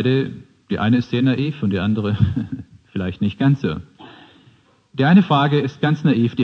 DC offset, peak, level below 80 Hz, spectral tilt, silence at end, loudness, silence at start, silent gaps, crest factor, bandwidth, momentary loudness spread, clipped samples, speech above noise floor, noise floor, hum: under 0.1%; -2 dBFS; -48 dBFS; -8.5 dB/octave; 0 s; -19 LUFS; 0 s; none; 16 dB; 6.6 kHz; 16 LU; under 0.1%; 36 dB; -54 dBFS; none